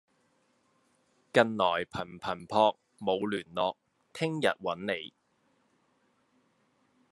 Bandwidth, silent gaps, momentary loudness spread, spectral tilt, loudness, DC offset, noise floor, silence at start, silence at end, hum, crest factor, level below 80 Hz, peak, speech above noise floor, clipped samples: 12 kHz; none; 11 LU; -5 dB/octave; -31 LUFS; under 0.1%; -72 dBFS; 1.35 s; 2.05 s; none; 28 dB; -74 dBFS; -6 dBFS; 42 dB; under 0.1%